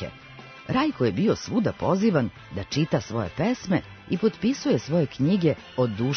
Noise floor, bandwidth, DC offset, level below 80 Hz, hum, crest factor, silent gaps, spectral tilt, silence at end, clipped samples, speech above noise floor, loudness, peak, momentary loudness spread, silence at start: -45 dBFS; 6.6 kHz; under 0.1%; -54 dBFS; none; 16 dB; none; -6.5 dB/octave; 0 s; under 0.1%; 20 dB; -25 LUFS; -10 dBFS; 9 LU; 0 s